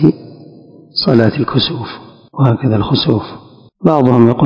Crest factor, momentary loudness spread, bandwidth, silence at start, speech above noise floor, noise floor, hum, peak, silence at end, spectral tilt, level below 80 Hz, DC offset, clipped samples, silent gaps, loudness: 14 dB; 19 LU; 5.8 kHz; 0 s; 27 dB; -39 dBFS; none; 0 dBFS; 0 s; -9 dB/octave; -42 dBFS; under 0.1%; 1%; none; -13 LUFS